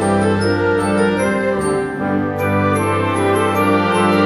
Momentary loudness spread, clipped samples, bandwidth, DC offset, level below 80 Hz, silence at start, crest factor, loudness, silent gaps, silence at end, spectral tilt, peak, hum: 4 LU; under 0.1%; 14.5 kHz; under 0.1%; -46 dBFS; 0 s; 12 dB; -16 LUFS; none; 0 s; -6 dB/octave; -2 dBFS; none